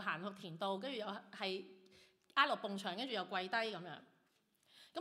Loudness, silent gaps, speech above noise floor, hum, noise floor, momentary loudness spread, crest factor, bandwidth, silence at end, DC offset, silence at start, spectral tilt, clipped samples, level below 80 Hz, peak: -41 LUFS; none; 36 dB; none; -78 dBFS; 15 LU; 24 dB; 15.5 kHz; 0 s; under 0.1%; 0 s; -4.5 dB/octave; under 0.1%; under -90 dBFS; -18 dBFS